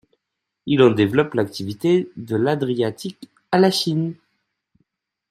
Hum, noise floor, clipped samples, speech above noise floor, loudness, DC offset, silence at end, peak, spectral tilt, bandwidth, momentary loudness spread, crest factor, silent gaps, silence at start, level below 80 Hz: none; -81 dBFS; under 0.1%; 61 dB; -20 LUFS; under 0.1%; 1.15 s; -2 dBFS; -6 dB/octave; 14.5 kHz; 12 LU; 20 dB; none; 0.65 s; -62 dBFS